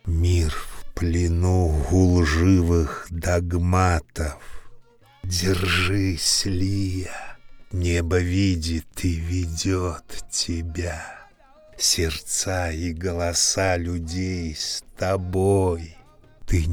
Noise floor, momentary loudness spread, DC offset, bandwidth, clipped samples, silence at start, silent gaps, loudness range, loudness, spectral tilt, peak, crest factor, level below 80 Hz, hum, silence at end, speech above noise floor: -51 dBFS; 12 LU; under 0.1%; 17.5 kHz; under 0.1%; 0.05 s; none; 4 LU; -23 LUFS; -4.5 dB/octave; -4 dBFS; 18 dB; -34 dBFS; none; 0 s; 29 dB